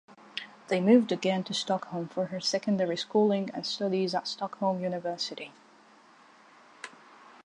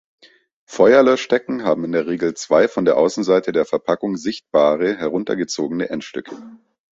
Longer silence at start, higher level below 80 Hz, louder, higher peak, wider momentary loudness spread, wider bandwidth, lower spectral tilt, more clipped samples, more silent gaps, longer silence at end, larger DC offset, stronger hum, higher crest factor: second, 0.1 s vs 0.7 s; second, -80 dBFS vs -60 dBFS; second, -29 LUFS vs -18 LUFS; second, -10 dBFS vs -2 dBFS; first, 18 LU vs 12 LU; first, 10.5 kHz vs 8 kHz; about the same, -5 dB/octave vs -5 dB/octave; neither; neither; first, 0.55 s vs 0.4 s; neither; neither; about the same, 20 dB vs 16 dB